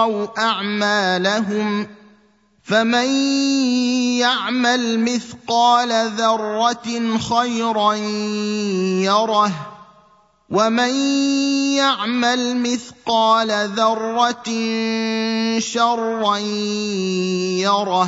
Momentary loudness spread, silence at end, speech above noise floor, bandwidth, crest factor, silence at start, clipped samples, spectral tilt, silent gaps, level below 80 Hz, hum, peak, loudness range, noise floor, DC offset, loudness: 5 LU; 0 s; 38 dB; 8 kHz; 18 dB; 0 s; under 0.1%; -3.5 dB/octave; none; -64 dBFS; none; -2 dBFS; 2 LU; -57 dBFS; under 0.1%; -18 LUFS